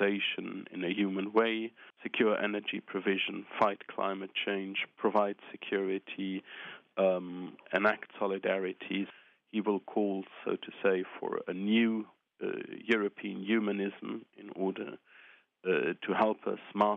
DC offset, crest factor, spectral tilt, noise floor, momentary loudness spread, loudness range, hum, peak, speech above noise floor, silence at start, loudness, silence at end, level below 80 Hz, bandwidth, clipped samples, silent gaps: under 0.1%; 22 dB; -7.5 dB/octave; -60 dBFS; 12 LU; 3 LU; none; -12 dBFS; 27 dB; 0 s; -33 LUFS; 0 s; -84 dBFS; 7 kHz; under 0.1%; none